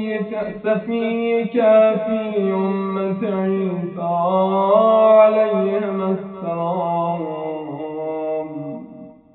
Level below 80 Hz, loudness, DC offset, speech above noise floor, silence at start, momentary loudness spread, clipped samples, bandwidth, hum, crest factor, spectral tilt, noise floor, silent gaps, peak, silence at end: -64 dBFS; -19 LUFS; under 0.1%; 23 dB; 0 s; 14 LU; under 0.1%; 4.1 kHz; none; 18 dB; -6.5 dB/octave; -40 dBFS; none; -2 dBFS; 0.25 s